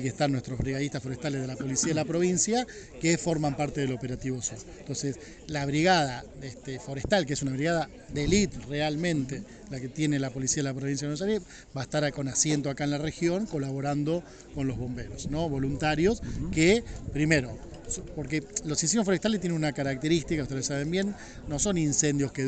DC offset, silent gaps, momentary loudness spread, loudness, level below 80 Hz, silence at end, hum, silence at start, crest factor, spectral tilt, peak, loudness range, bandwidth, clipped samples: under 0.1%; none; 11 LU; -29 LUFS; -46 dBFS; 0 s; none; 0 s; 20 dB; -4.5 dB/octave; -8 dBFS; 3 LU; 9.4 kHz; under 0.1%